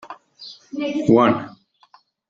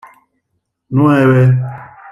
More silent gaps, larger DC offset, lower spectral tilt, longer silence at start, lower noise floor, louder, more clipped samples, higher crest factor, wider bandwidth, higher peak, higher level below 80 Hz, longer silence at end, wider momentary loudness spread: neither; neither; second, -7.5 dB/octave vs -9.5 dB/octave; second, 0.05 s vs 0.9 s; second, -55 dBFS vs -70 dBFS; second, -18 LUFS vs -12 LUFS; neither; first, 20 dB vs 12 dB; first, 7.6 kHz vs 3.4 kHz; about the same, -2 dBFS vs -2 dBFS; second, -60 dBFS vs -52 dBFS; first, 0.8 s vs 0 s; first, 24 LU vs 16 LU